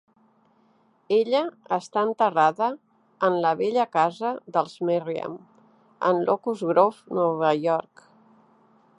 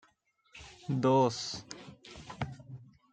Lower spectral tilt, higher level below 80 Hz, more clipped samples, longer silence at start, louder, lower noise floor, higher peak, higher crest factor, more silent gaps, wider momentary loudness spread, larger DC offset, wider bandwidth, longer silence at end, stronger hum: about the same, -6.5 dB/octave vs -6 dB/octave; second, -78 dBFS vs -64 dBFS; neither; first, 1.1 s vs 0.55 s; first, -24 LUFS vs -32 LUFS; second, -62 dBFS vs -71 dBFS; first, -4 dBFS vs -14 dBFS; about the same, 20 dB vs 20 dB; neither; second, 8 LU vs 24 LU; neither; first, 11 kHz vs 9.2 kHz; first, 1.2 s vs 0.3 s; neither